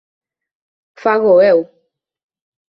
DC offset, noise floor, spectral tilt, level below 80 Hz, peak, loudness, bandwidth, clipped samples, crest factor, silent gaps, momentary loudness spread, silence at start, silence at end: under 0.1%; -65 dBFS; -7.5 dB/octave; -62 dBFS; -2 dBFS; -13 LUFS; 5.8 kHz; under 0.1%; 16 dB; none; 12 LU; 1.05 s; 1.05 s